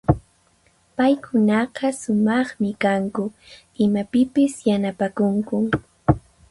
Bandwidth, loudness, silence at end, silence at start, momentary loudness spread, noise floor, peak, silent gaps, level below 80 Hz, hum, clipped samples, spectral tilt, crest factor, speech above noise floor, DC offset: 11.5 kHz; -21 LUFS; 0.3 s; 0.1 s; 6 LU; -60 dBFS; -2 dBFS; none; -42 dBFS; none; under 0.1%; -7 dB/octave; 20 dB; 40 dB; under 0.1%